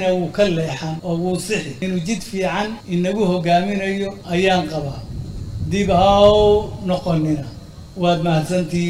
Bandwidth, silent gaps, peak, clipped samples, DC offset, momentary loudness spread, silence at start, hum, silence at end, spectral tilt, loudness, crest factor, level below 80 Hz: 15 kHz; none; -2 dBFS; under 0.1%; under 0.1%; 13 LU; 0 s; none; 0 s; -6 dB/octave; -19 LUFS; 16 dB; -36 dBFS